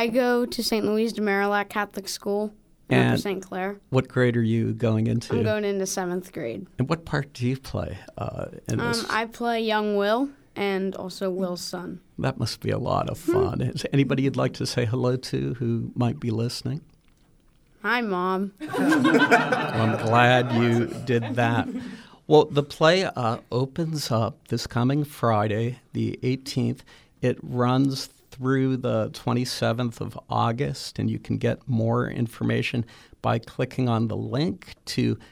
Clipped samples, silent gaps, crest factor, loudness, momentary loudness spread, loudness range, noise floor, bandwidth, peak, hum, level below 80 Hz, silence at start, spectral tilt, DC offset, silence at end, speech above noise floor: under 0.1%; none; 20 dB; -25 LUFS; 11 LU; 6 LU; -58 dBFS; 17 kHz; -4 dBFS; none; -54 dBFS; 0 s; -6 dB/octave; under 0.1%; 0.05 s; 34 dB